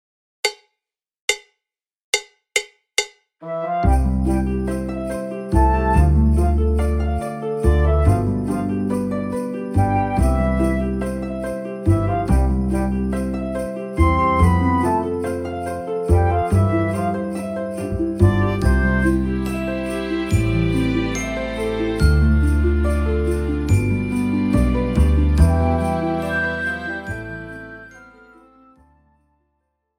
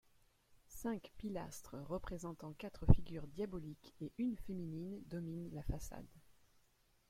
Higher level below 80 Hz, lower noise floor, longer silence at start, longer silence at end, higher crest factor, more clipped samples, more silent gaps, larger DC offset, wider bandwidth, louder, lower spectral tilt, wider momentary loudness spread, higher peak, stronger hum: first, -24 dBFS vs -48 dBFS; first, -84 dBFS vs -75 dBFS; about the same, 0.45 s vs 0.5 s; first, 1.95 s vs 0.9 s; second, 18 dB vs 30 dB; neither; first, 1.22-1.28 s, 2.03-2.13 s vs none; neither; second, 14 kHz vs 15.5 kHz; first, -20 LUFS vs -44 LUFS; about the same, -6.5 dB/octave vs -7.5 dB/octave; second, 9 LU vs 16 LU; first, -2 dBFS vs -12 dBFS; neither